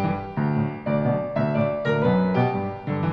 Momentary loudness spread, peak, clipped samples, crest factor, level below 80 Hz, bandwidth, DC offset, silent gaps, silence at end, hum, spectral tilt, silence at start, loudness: 6 LU; -10 dBFS; under 0.1%; 14 dB; -50 dBFS; 6.2 kHz; under 0.1%; none; 0 s; none; -10 dB/octave; 0 s; -24 LUFS